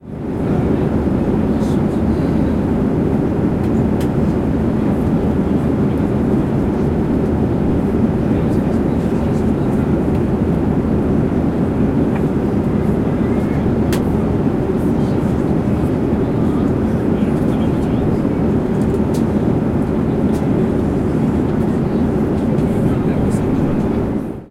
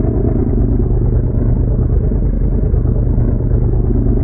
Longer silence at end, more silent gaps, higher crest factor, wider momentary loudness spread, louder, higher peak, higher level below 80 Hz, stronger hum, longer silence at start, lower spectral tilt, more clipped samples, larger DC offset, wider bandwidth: about the same, 0 s vs 0 s; neither; about the same, 10 dB vs 12 dB; about the same, 1 LU vs 1 LU; about the same, -17 LUFS vs -16 LUFS; second, -6 dBFS vs -2 dBFS; second, -28 dBFS vs -14 dBFS; neither; about the same, 0 s vs 0 s; second, -9 dB/octave vs -15.5 dB/octave; neither; neither; first, 14 kHz vs 2.1 kHz